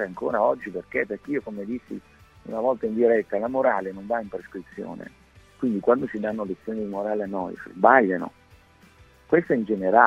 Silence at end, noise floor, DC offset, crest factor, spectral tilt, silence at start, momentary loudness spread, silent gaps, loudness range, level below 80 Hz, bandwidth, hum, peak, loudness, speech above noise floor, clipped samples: 0 s; -54 dBFS; under 0.1%; 24 dB; -8.5 dB/octave; 0 s; 16 LU; none; 4 LU; -60 dBFS; 7.8 kHz; none; -2 dBFS; -25 LUFS; 30 dB; under 0.1%